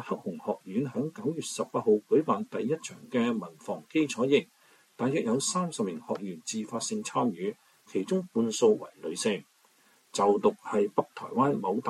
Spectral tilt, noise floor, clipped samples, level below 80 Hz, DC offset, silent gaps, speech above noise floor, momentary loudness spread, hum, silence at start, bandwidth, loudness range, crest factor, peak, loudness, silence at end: -5 dB/octave; -64 dBFS; under 0.1%; -78 dBFS; under 0.1%; none; 35 dB; 10 LU; none; 0 s; 13.5 kHz; 3 LU; 20 dB; -10 dBFS; -30 LUFS; 0 s